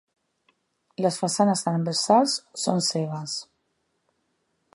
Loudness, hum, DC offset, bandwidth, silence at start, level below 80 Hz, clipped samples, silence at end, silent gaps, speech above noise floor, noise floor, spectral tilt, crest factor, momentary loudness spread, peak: -24 LUFS; none; under 0.1%; 11.5 kHz; 1 s; -76 dBFS; under 0.1%; 1.3 s; none; 50 dB; -74 dBFS; -4.5 dB/octave; 20 dB; 12 LU; -6 dBFS